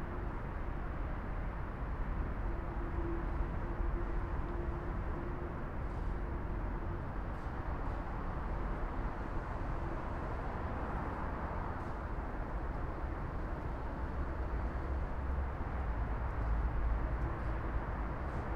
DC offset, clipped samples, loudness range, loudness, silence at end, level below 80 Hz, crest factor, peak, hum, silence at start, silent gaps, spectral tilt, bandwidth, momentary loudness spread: under 0.1%; under 0.1%; 3 LU; -41 LUFS; 0 s; -40 dBFS; 14 dB; -22 dBFS; none; 0 s; none; -9 dB/octave; 5.8 kHz; 3 LU